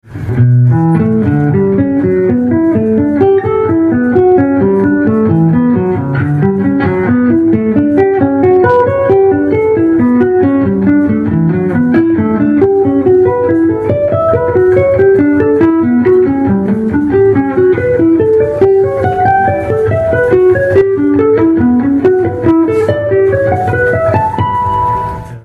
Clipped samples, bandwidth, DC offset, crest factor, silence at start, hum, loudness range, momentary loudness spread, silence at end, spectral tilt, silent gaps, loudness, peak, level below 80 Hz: under 0.1%; 4.7 kHz; under 0.1%; 8 dB; 0.1 s; none; 1 LU; 4 LU; 0.05 s; -10.5 dB/octave; none; -10 LUFS; 0 dBFS; -36 dBFS